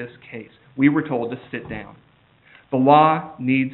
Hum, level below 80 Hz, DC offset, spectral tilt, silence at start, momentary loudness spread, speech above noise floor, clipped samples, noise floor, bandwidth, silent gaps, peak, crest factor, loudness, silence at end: none; -58 dBFS; under 0.1%; -5.5 dB/octave; 0 s; 23 LU; 34 dB; under 0.1%; -54 dBFS; 4.3 kHz; none; -2 dBFS; 20 dB; -19 LUFS; 0 s